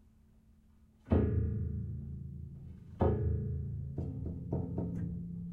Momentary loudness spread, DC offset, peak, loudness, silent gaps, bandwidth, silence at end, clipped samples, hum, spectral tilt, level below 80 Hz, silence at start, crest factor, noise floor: 14 LU; under 0.1%; -16 dBFS; -36 LUFS; none; 3.7 kHz; 0 s; under 0.1%; none; -11.5 dB/octave; -46 dBFS; 1.05 s; 20 dB; -63 dBFS